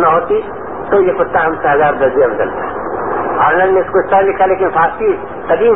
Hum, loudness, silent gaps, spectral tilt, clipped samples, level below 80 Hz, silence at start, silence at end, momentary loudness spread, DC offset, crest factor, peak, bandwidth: none; -13 LUFS; none; -11 dB/octave; under 0.1%; -42 dBFS; 0 s; 0 s; 8 LU; 2%; 12 dB; 0 dBFS; 3.8 kHz